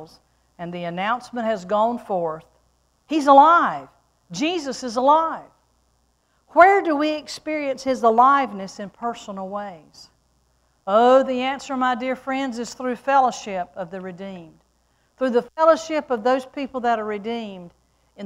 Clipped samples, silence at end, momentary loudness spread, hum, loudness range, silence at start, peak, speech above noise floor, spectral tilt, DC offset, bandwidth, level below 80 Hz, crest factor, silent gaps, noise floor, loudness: under 0.1%; 0 s; 19 LU; none; 5 LU; 0 s; 0 dBFS; 45 dB; -4.5 dB/octave; under 0.1%; 12 kHz; -62 dBFS; 22 dB; none; -65 dBFS; -20 LUFS